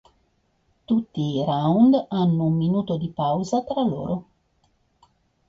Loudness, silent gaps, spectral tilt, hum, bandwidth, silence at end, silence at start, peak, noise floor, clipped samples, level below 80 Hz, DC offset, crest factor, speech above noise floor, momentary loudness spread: -22 LUFS; none; -8.5 dB/octave; none; 7.6 kHz; 1.25 s; 0.9 s; -8 dBFS; -67 dBFS; under 0.1%; -56 dBFS; under 0.1%; 16 dB; 46 dB; 9 LU